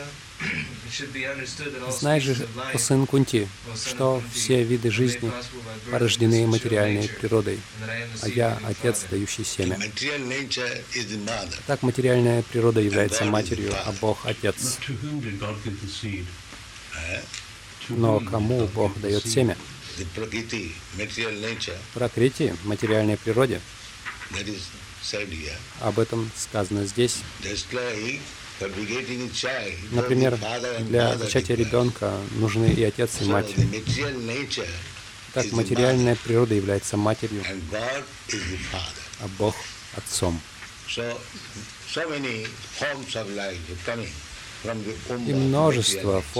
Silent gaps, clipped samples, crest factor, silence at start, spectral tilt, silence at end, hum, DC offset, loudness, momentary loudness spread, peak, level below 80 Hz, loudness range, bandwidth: none; under 0.1%; 18 dB; 0 s; -5 dB/octave; 0 s; none; under 0.1%; -25 LUFS; 12 LU; -6 dBFS; -48 dBFS; 7 LU; 16 kHz